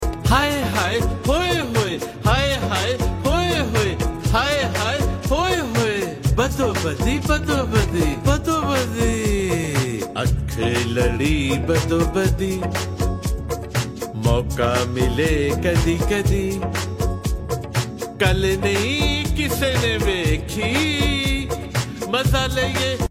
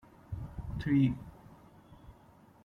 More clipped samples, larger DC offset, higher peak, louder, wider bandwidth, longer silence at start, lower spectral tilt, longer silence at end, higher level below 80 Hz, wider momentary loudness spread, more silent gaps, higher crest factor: neither; neither; first, -2 dBFS vs -16 dBFS; first, -21 LUFS vs -33 LUFS; first, 16.5 kHz vs 6.2 kHz; second, 0 s vs 0.3 s; second, -5 dB/octave vs -9 dB/octave; second, 0.05 s vs 0.5 s; first, -28 dBFS vs -50 dBFS; second, 6 LU vs 17 LU; neither; about the same, 18 dB vs 18 dB